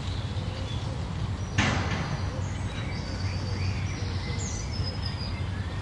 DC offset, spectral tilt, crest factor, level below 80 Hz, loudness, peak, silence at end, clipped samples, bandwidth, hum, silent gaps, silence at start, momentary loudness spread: under 0.1%; -5 dB/octave; 20 dB; -40 dBFS; -31 LUFS; -10 dBFS; 0 s; under 0.1%; 11 kHz; none; none; 0 s; 6 LU